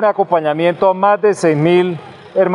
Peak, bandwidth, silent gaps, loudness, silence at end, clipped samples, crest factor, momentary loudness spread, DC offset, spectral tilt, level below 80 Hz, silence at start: 0 dBFS; 11 kHz; none; -14 LUFS; 0 s; under 0.1%; 14 dB; 8 LU; under 0.1%; -6.5 dB/octave; -62 dBFS; 0 s